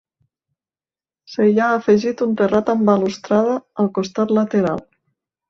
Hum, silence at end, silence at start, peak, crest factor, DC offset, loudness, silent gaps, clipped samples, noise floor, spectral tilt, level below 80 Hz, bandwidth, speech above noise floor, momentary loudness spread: none; 0.7 s; 1.3 s; -4 dBFS; 16 dB; under 0.1%; -18 LUFS; none; under 0.1%; under -90 dBFS; -7 dB/octave; -60 dBFS; 7.2 kHz; over 73 dB; 6 LU